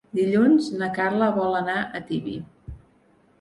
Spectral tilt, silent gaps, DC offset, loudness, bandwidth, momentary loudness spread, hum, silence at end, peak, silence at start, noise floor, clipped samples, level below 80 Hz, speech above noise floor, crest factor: -7 dB/octave; none; under 0.1%; -23 LUFS; 11.5 kHz; 20 LU; none; 0.65 s; -8 dBFS; 0.15 s; -60 dBFS; under 0.1%; -52 dBFS; 37 dB; 16 dB